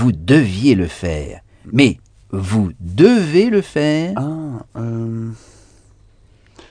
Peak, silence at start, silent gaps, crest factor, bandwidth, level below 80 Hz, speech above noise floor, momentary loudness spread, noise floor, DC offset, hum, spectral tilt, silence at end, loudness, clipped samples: 0 dBFS; 0 s; none; 16 dB; 10 kHz; -40 dBFS; 34 dB; 15 LU; -50 dBFS; under 0.1%; none; -7 dB/octave; 1.35 s; -16 LUFS; under 0.1%